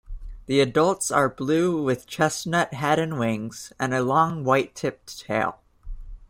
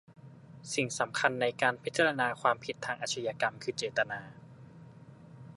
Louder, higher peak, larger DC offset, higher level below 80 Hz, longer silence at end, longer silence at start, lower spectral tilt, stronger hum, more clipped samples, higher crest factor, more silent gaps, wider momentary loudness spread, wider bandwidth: first, -23 LUFS vs -32 LUFS; first, -6 dBFS vs -10 dBFS; neither; first, -44 dBFS vs -74 dBFS; about the same, 0.05 s vs 0 s; about the same, 0.1 s vs 0.1 s; first, -5 dB/octave vs -3 dB/octave; neither; neither; second, 18 dB vs 24 dB; neither; second, 10 LU vs 22 LU; first, 16 kHz vs 11.5 kHz